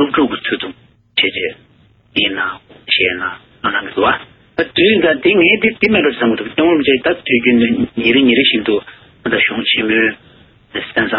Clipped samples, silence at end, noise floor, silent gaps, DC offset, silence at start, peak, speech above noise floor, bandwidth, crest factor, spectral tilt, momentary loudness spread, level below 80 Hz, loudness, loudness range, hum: under 0.1%; 0 s; -50 dBFS; none; under 0.1%; 0 s; 0 dBFS; 36 dB; 5.6 kHz; 14 dB; -8.5 dB/octave; 11 LU; -48 dBFS; -14 LUFS; 5 LU; none